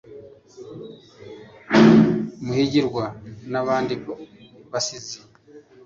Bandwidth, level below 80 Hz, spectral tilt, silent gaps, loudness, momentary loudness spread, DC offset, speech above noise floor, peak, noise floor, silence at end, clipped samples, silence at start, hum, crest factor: 7.6 kHz; -56 dBFS; -5.5 dB/octave; none; -20 LUFS; 27 LU; under 0.1%; 25 dB; -2 dBFS; -49 dBFS; 0.25 s; under 0.1%; 0.1 s; none; 20 dB